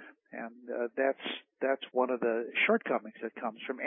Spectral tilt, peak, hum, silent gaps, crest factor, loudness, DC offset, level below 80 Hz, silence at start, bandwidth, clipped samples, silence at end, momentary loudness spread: 1 dB/octave; -14 dBFS; none; none; 18 dB; -32 LUFS; under 0.1%; -88 dBFS; 0 s; 3.8 kHz; under 0.1%; 0 s; 15 LU